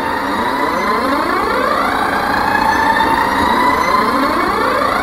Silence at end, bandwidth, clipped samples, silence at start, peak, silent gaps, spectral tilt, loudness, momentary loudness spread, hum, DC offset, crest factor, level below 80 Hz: 0 s; 16 kHz; under 0.1%; 0 s; 0 dBFS; none; -4 dB/octave; -14 LUFS; 3 LU; none; 0.2%; 14 dB; -38 dBFS